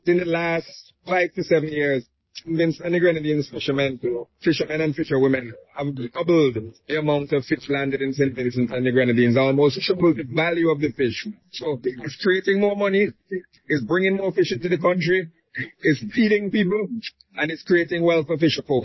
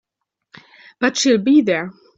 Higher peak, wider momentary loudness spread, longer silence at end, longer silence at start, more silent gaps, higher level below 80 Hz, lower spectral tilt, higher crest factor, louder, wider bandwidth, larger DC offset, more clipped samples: second, -8 dBFS vs -2 dBFS; first, 11 LU vs 8 LU; second, 0 s vs 0.25 s; second, 0.05 s vs 1 s; neither; first, -58 dBFS vs -64 dBFS; first, -7 dB/octave vs -3.5 dB/octave; about the same, 14 dB vs 16 dB; second, -22 LUFS vs -16 LUFS; second, 6.2 kHz vs 7.8 kHz; neither; neither